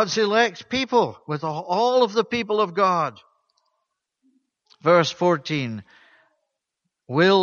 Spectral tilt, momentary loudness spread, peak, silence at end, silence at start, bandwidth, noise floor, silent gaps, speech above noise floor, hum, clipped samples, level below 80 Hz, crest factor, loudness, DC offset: -5 dB/octave; 9 LU; -4 dBFS; 0 s; 0 s; 7.2 kHz; -80 dBFS; none; 59 dB; none; under 0.1%; -66 dBFS; 20 dB; -22 LUFS; under 0.1%